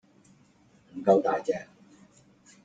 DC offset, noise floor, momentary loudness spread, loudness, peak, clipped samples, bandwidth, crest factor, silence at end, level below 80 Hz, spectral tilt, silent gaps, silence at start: under 0.1%; -61 dBFS; 13 LU; -26 LUFS; -10 dBFS; under 0.1%; 9 kHz; 22 dB; 1 s; -74 dBFS; -7 dB/octave; none; 0.95 s